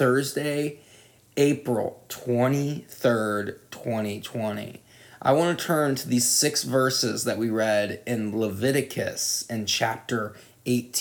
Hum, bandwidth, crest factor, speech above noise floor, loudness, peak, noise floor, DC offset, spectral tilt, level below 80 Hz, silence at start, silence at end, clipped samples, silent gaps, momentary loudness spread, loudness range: none; 19.5 kHz; 18 dB; 29 dB; -25 LUFS; -8 dBFS; -54 dBFS; under 0.1%; -4 dB/octave; -70 dBFS; 0 s; 0 s; under 0.1%; none; 9 LU; 4 LU